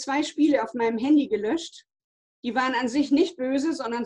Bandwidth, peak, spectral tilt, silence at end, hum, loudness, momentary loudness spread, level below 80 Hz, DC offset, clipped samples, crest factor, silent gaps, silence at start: 9.8 kHz; -8 dBFS; -4 dB/octave; 0 s; none; -24 LUFS; 7 LU; -66 dBFS; under 0.1%; under 0.1%; 16 dB; 2.04-2.43 s; 0 s